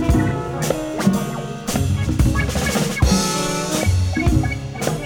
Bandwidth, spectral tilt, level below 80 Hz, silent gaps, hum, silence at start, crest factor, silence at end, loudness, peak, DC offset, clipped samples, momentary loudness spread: 17.5 kHz; -5 dB/octave; -26 dBFS; none; none; 0 s; 16 dB; 0 s; -20 LUFS; -4 dBFS; under 0.1%; under 0.1%; 6 LU